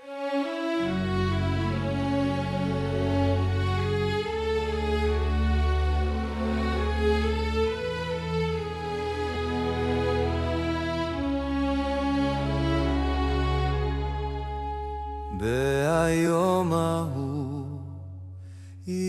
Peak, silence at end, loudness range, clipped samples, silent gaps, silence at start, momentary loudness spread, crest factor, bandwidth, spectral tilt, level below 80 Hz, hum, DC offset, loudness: -12 dBFS; 0 s; 2 LU; under 0.1%; none; 0 s; 8 LU; 14 dB; 13 kHz; -6.5 dB/octave; -34 dBFS; none; under 0.1%; -27 LUFS